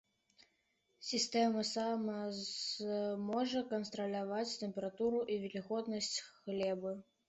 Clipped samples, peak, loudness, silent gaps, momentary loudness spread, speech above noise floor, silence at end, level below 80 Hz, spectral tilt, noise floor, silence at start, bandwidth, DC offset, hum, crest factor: under 0.1%; -22 dBFS; -38 LUFS; none; 7 LU; 41 dB; 0.25 s; -78 dBFS; -4 dB/octave; -80 dBFS; 1 s; 8.2 kHz; under 0.1%; none; 18 dB